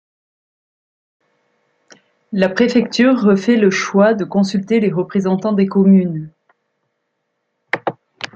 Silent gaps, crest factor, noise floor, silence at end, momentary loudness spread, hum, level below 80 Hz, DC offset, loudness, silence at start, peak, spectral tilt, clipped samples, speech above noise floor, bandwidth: none; 16 dB; -72 dBFS; 0.1 s; 12 LU; none; -62 dBFS; under 0.1%; -15 LUFS; 2.3 s; -2 dBFS; -6.5 dB/octave; under 0.1%; 58 dB; 7.6 kHz